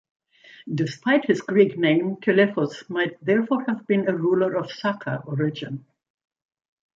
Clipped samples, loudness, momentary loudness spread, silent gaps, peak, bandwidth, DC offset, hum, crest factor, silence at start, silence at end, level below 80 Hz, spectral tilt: under 0.1%; -23 LUFS; 10 LU; none; -4 dBFS; 7.6 kHz; under 0.1%; none; 18 dB; 0.65 s; 1.15 s; -70 dBFS; -7 dB/octave